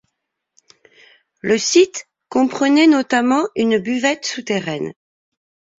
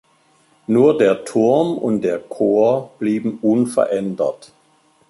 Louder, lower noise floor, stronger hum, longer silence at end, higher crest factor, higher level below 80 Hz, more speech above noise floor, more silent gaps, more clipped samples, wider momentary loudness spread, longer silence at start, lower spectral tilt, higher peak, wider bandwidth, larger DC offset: about the same, -17 LUFS vs -18 LUFS; first, -76 dBFS vs -57 dBFS; neither; about the same, 0.85 s vs 0.75 s; about the same, 18 dB vs 16 dB; about the same, -62 dBFS vs -62 dBFS; first, 60 dB vs 40 dB; neither; neither; first, 13 LU vs 8 LU; first, 1.45 s vs 0.7 s; second, -3.5 dB/octave vs -7 dB/octave; about the same, -2 dBFS vs -2 dBFS; second, 7.8 kHz vs 11.5 kHz; neither